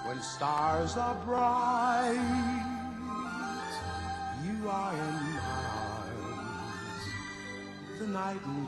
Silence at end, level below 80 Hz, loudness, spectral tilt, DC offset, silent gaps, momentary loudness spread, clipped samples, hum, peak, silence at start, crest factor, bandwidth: 0 s; -54 dBFS; -34 LUFS; -5 dB/octave; under 0.1%; none; 11 LU; under 0.1%; none; -18 dBFS; 0 s; 16 dB; 12.5 kHz